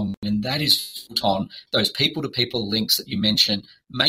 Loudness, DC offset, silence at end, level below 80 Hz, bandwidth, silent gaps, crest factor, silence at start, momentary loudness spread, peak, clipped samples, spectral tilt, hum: -21 LUFS; under 0.1%; 0 s; -54 dBFS; 16 kHz; 0.17-0.22 s; 22 dB; 0 s; 8 LU; -2 dBFS; under 0.1%; -3.5 dB/octave; none